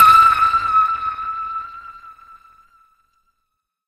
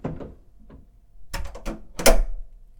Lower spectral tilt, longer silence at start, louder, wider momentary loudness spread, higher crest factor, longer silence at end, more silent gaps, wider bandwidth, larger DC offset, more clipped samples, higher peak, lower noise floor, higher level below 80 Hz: second, -1.5 dB/octave vs -3 dB/octave; about the same, 0 s vs 0.05 s; first, -15 LUFS vs -26 LUFS; first, 24 LU vs 21 LU; second, 18 dB vs 24 dB; first, 1.75 s vs 0.25 s; neither; second, 14 kHz vs 19 kHz; neither; neither; about the same, 0 dBFS vs 0 dBFS; first, -75 dBFS vs -48 dBFS; second, -50 dBFS vs -28 dBFS